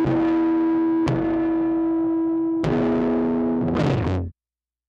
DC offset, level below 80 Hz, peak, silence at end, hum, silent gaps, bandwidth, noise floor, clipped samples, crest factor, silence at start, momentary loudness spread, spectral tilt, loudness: under 0.1%; -44 dBFS; -8 dBFS; 0.55 s; none; none; 7 kHz; under -90 dBFS; under 0.1%; 14 dB; 0 s; 3 LU; -9 dB/octave; -22 LUFS